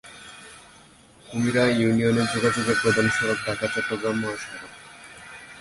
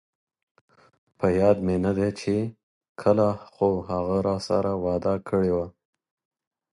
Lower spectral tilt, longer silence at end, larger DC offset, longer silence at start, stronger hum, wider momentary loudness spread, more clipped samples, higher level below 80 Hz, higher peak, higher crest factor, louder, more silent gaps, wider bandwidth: second, -5 dB/octave vs -7.5 dB/octave; second, 0 s vs 1.1 s; neither; second, 0.05 s vs 1.2 s; neither; first, 22 LU vs 6 LU; neither; second, -54 dBFS vs -48 dBFS; about the same, -8 dBFS vs -6 dBFS; about the same, 18 dB vs 20 dB; about the same, -23 LUFS vs -25 LUFS; second, none vs 2.63-2.81 s, 2.89-2.95 s; about the same, 11.5 kHz vs 11.5 kHz